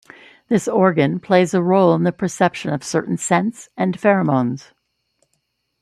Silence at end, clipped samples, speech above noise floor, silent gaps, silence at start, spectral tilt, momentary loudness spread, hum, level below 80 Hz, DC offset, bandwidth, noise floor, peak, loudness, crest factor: 1.2 s; under 0.1%; 53 dB; none; 0.5 s; -6 dB/octave; 8 LU; none; -62 dBFS; under 0.1%; 12.5 kHz; -70 dBFS; -2 dBFS; -18 LUFS; 18 dB